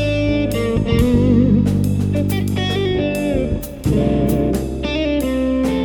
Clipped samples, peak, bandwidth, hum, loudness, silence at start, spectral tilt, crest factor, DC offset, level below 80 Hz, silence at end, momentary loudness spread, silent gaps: under 0.1%; -4 dBFS; 19.5 kHz; none; -18 LUFS; 0 s; -7 dB/octave; 14 dB; under 0.1%; -28 dBFS; 0 s; 6 LU; none